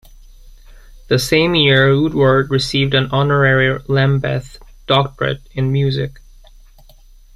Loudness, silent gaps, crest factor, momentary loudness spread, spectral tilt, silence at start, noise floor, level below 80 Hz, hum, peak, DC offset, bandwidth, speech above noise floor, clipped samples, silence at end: -15 LUFS; none; 16 dB; 9 LU; -6 dB/octave; 0.45 s; -44 dBFS; -38 dBFS; none; 0 dBFS; under 0.1%; 13.5 kHz; 29 dB; under 0.1%; 1.25 s